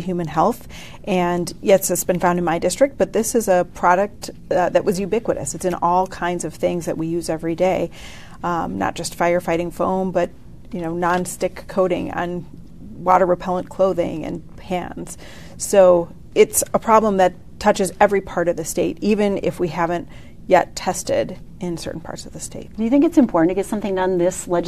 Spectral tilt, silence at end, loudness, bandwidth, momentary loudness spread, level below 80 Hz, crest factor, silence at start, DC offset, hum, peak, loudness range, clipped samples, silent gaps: -5 dB/octave; 0 s; -20 LUFS; 14 kHz; 15 LU; -44 dBFS; 18 dB; 0 s; 0.9%; none; 0 dBFS; 5 LU; under 0.1%; none